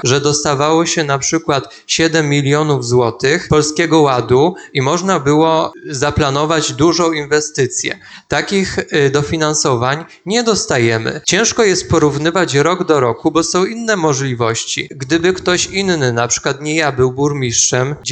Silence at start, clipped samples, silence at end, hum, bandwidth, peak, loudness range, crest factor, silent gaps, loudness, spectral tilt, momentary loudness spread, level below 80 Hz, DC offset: 0.05 s; under 0.1%; 0 s; none; 9.4 kHz; 0 dBFS; 2 LU; 14 dB; none; -14 LUFS; -4 dB/octave; 5 LU; -42 dBFS; under 0.1%